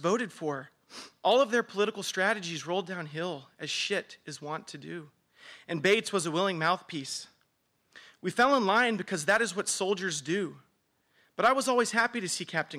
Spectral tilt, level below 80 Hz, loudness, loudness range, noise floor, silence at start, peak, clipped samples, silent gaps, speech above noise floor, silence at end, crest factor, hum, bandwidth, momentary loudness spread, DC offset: -3 dB/octave; -76 dBFS; -29 LUFS; 5 LU; -74 dBFS; 0 s; -12 dBFS; under 0.1%; none; 45 dB; 0 s; 18 dB; none; 16 kHz; 15 LU; under 0.1%